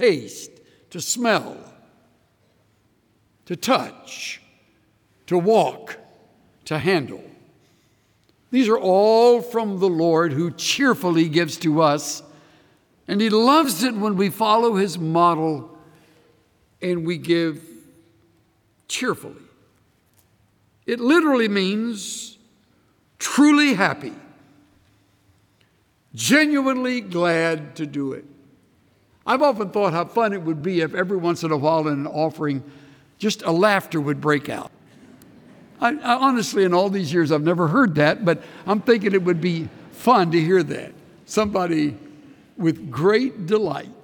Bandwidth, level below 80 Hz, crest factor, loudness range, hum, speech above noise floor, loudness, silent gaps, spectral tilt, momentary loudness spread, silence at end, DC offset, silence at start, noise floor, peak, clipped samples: 19 kHz; -66 dBFS; 18 dB; 8 LU; none; 43 dB; -20 LUFS; none; -5 dB/octave; 15 LU; 0.1 s; under 0.1%; 0 s; -62 dBFS; -4 dBFS; under 0.1%